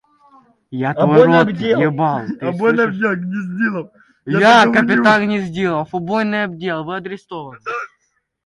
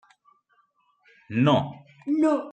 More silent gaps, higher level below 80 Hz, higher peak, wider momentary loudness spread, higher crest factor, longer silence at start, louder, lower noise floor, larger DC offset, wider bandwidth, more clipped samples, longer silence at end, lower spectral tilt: neither; first, -58 dBFS vs -70 dBFS; first, 0 dBFS vs -8 dBFS; about the same, 17 LU vs 15 LU; about the same, 16 dB vs 18 dB; second, 0.7 s vs 1.3 s; first, -16 LUFS vs -24 LUFS; about the same, -66 dBFS vs -67 dBFS; neither; first, 11 kHz vs 8.8 kHz; neither; first, 0.6 s vs 0 s; about the same, -6.5 dB/octave vs -7.5 dB/octave